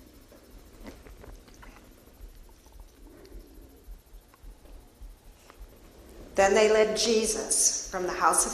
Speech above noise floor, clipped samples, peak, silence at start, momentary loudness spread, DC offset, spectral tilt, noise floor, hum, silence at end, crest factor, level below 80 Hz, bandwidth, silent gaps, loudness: 29 dB; under 0.1%; -8 dBFS; 0.55 s; 27 LU; under 0.1%; -1.5 dB/octave; -53 dBFS; none; 0 s; 22 dB; -50 dBFS; 14.5 kHz; none; -24 LUFS